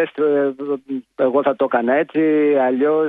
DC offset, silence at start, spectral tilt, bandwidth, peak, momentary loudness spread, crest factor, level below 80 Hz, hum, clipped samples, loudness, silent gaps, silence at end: under 0.1%; 0 s; -9 dB/octave; 3.9 kHz; -4 dBFS; 9 LU; 14 dB; -70 dBFS; none; under 0.1%; -18 LUFS; none; 0 s